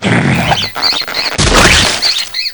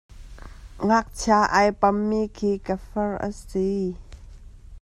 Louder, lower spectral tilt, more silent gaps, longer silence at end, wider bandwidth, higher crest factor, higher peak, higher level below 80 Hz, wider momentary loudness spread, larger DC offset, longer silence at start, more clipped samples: first, -9 LUFS vs -23 LUFS; second, -3 dB/octave vs -5.5 dB/octave; neither; about the same, 0 s vs 0.05 s; first, over 20 kHz vs 12.5 kHz; second, 12 dB vs 20 dB; first, 0 dBFS vs -4 dBFS; first, -24 dBFS vs -42 dBFS; second, 7 LU vs 10 LU; first, 0.7% vs under 0.1%; second, 0 s vs 0.15 s; first, 0.7% vs under 0.1%